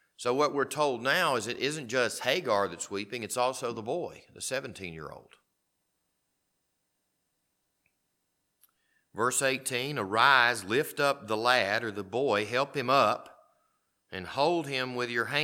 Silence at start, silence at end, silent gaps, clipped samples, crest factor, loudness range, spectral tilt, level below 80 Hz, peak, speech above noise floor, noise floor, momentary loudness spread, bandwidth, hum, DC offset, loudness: 0.2 s; 0 s; none; under 0.1%; 24 dB; 13 LU; -3 dB/octave; -74 dBFS; -6 dBFS; 50 dB; -79 dBFS; 12 LU; 18.5 kHz; none; under 0.1%; -28 LUFS